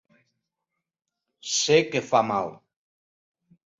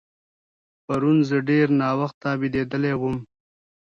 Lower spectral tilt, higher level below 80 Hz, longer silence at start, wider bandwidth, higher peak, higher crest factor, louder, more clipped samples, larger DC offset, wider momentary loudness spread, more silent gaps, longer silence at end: second, -3 dB/octave vs -8.5 dB/octave; second, -68 dBFS vs -56 dBFS; first, 1.45 s vs 0.9 s; first, 8 kHz vs 7.2 kHz; about the same, -6 dBFS vs -8 dBFS; first, 22 dB vs 16 dB; about the same, -23 LUFS vs -22 LUFS; neither; neither; first, 13 LU vs 8 LU; second, none vs 2.14-2.21 s; first, 1.25 s vs 0.75 s